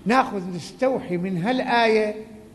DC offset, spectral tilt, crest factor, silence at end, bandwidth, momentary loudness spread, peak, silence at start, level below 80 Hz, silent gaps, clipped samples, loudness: under 0.1%; -6 dB/octave; 18 dB; 0.05 s; 12 kHz; 11 LU; -6 dBFS; 0 s; -58 dBFS; none; under 0.1%; -22 LUFS